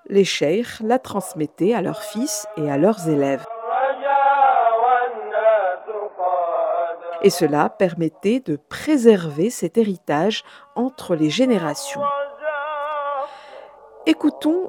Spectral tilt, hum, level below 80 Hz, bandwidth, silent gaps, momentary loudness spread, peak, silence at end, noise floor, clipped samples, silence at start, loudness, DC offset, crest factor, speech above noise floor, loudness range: -5 dB/octave; none; -66 dBFS; 18 kHz; none; 10 LU; 0 dBFS; 0 s; -42 dBFS; under 0.1%; 0.1 s; -20 LUFS; under 0.1%; 20 dB; 22 dB; 4 LU